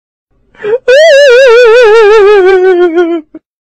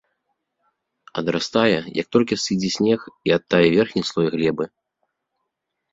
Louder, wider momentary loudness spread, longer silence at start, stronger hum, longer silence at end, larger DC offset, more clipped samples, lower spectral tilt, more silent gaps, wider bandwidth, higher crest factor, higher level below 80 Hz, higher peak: first, -4 LUFS vs -20 LUFS; first, 11 LU vs 8 LU; second, 0.6 s vs 1.15 s; neither; second, 0.25 s vs 1.25 s; neither; neither; second, -2.5 dB/octave vs -5 dB/octave; neither; first, 10 kHz vs 7.8 kHz; second, 4 dB vs 20 dB; first, -40 dBFS vs -58 dBFS; about the same, 0 dBFS vs -2 dBFS